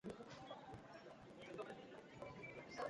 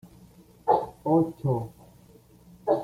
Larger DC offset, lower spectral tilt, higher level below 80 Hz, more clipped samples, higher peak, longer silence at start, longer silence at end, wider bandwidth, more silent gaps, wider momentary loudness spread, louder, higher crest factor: neither; second, -5.5 dB/octave vs -9.5 dB/octave; second, -78 dBFS vs -60 dBFS; neither; second, -34 dBFS vs -8 dBFS; second, 0.05 s vs 0.65 s; about the same, 0 s vs 0 s; second, 11 kHz vs 15 kHz; neither; second, 6 LU vs 10 LU; second, -56 LUFS vs -27 LUFS; about the same, 20 dB vs 20 dB